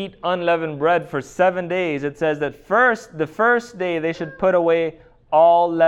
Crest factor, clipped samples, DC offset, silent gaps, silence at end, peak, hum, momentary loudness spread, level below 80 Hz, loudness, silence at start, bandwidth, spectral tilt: 14 dB; under 0.1%; under 0.1%; none; 0 s; -4 dBFS; none; 9 LU; -56 dBFS; -19 LUFS; 0 s; 10.5 kHz; -6 dB/octave